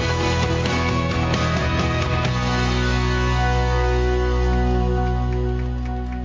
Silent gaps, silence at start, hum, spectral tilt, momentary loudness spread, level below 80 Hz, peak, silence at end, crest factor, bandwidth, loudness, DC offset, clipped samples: none; 0 s; none; -6 dB/octave; 3 LU; -24 dBFS; -8 dBFS; 0 s; 12 dB; 7.6 kHz; -21 LUFS; under 0.1%; under 0.1%